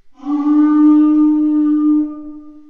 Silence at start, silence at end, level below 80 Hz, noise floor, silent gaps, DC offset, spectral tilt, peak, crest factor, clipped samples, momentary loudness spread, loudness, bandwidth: 0.25 s; 0.2 s; -50 dBFS; -33 dBFS; none; 0.6%; -8 dB/octave; -4 dBFS; 10 dB; under 0.1%; 12 LU; -13 LUFS; 3.2 kHz